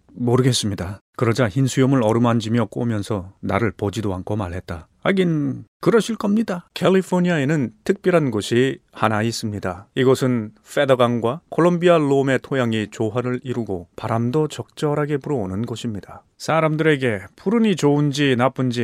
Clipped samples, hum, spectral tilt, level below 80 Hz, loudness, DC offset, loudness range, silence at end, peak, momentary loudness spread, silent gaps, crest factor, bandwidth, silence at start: under 0.1%; none; -6 dB/octave; -54 dBFS; -20 LUFS; under 0.1%; 4 LU; 0 s; 0 dBFS; 9 LU; 1.01-1.13 s, 5.68-5.80 s; 18 dB; 15 kHz; 0.15 s